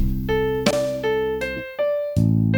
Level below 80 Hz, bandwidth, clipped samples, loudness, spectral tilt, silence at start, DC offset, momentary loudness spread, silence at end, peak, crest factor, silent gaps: -32 dBFS; over 20 kHz; under 0.1%; -22 LUFS; -6.5 dB/octave; 0 s; under 0.1%; 5 LU; 0 s; -4 dBFS; 18 dB; none